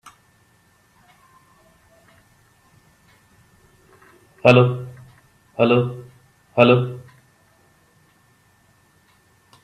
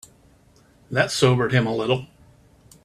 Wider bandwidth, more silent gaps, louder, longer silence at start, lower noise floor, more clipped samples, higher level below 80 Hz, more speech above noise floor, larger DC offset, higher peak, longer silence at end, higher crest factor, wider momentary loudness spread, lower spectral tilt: second, 9.8 kHz vs 13.5 kHz; neither; first, -18 LUFS vs -21 LUFS; first, 4.45 s vs 0.9 s; about the same, -58 dBFS vs -55 dBFS; neither; second, -62 dBFS vs -56 dBFS; first, 43 dB vs 35 dB; neither; about the same, 0 dBFS vs -2 dBFS; first, 2.65 s vs 0.8 s; about the same, 24 dB vs 22 dB; first, 24 LU vs 7 LU; first, -7.5 dB/octave vs -5 dB/octave